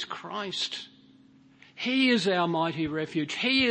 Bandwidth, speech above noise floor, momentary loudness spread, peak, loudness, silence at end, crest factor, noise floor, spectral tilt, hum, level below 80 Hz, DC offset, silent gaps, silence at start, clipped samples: 8.8 kHz; 30 dB; 12 LU; -12 dBFS; -27 LUFS; 0 s; 16 dB; -57 dBFS; -4.5 dB/octave; none; -66 dBFS; under 0.1%; none; 0 s; under 0.1%